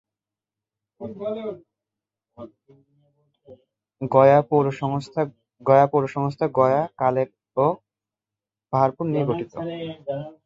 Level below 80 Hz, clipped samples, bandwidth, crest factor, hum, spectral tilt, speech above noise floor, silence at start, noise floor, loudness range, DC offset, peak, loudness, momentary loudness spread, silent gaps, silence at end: -64 dBFS; under 0.1%; 7.8 kHz; 22 dB; none; -8.5 dB/octave; 68 dB; 1 s; -89 dBFS; 18 LU; under 0.1%; -2 dBFS; -22 LUFS; 16 LU; none; 0.15 s